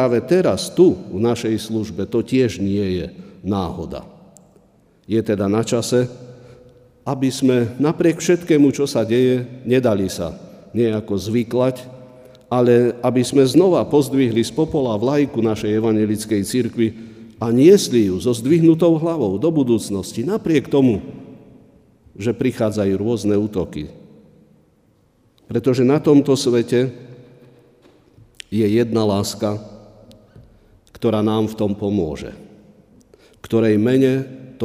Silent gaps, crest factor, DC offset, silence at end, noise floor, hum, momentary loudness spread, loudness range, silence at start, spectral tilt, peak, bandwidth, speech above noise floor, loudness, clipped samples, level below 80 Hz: none; 18 dB; under 0.1%; 0 s; -57 dBFS; none; 12 LU; 7 LU; 0 s; -6.5 dB/octave; -2 dBFS; 15.5 kHz; 40 dB; -18 LUFS; under 0.1%; -50 dBFS